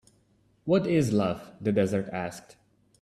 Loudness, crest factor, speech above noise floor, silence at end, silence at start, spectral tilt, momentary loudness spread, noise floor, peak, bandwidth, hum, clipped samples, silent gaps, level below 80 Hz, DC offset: -27 LUFS; 18 dB; 39 dB; 0.6 s; 0.65 s; -7 dB/octave; 13 LU; -66 dBFS; -12 dBFS; 13.5 kHz; none; under 0.1%; none; -62 dBFS; under 0.1%